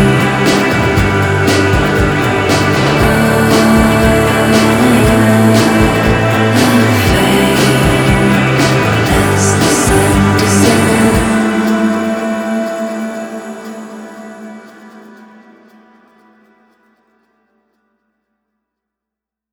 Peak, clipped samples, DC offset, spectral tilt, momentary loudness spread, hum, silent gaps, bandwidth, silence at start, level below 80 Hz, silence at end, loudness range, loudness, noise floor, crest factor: 0 dBFS; under 0.1%; under 0.1%; -5 dB/octave; 12 LU; none; none; over 20 kHz; 0 s; -26 dBFS; 4.55 s; 12 LU; -10 LUFS; -83 dBFS; 12 dB